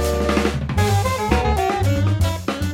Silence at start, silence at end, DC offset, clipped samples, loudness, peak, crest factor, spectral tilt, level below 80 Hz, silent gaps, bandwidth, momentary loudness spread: 0 s; 0 s; under 0.1%; under 0.1%; -20 LUFS; -2 dBFS; 16 dB; -6 dB/octave; -28 dBFS; none; 16.5 kHz; 3 LU